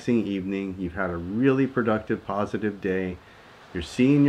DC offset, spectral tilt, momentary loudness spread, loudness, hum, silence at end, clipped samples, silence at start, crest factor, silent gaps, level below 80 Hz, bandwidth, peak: under 0.1%; -7.5 dB/octave; 11 LU; -26 LUFS; none; 0 s; under 0.1%; 0 s; 18 dB; none; -52 dBFS; 10 kHz; -8 dBFS